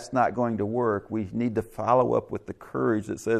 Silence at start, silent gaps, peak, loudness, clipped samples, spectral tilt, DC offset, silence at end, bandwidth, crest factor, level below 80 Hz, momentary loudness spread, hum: 0 s; none; -8 dBFS; -27 LUFS; under 0.1%; -7.5 dB/octave; under 0.1%; 0 s; 14 kHz; 18 dB; -58 dBFS; 9 LU; none